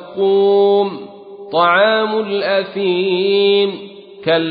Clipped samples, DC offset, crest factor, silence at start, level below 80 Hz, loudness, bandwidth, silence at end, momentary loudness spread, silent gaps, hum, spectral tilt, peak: under 0.1%; under 0.1%; 14 dB; 0 s; -68 dBFS; -15 LUFS; 5 kHz; 0 s; 19 LU; none; none; -10.5 dB/octave; -2 dBFS